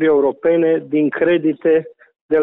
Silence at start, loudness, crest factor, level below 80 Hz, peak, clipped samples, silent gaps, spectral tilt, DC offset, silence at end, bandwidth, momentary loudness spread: 0 s; -16 LUFS; 10 dB; -60 dBFS; -6 dBFS; under 0.1%; 2.21-2.29 s; -10 dB/octave; under 0.1%; 0 s; 3.8 kHz; 4 LU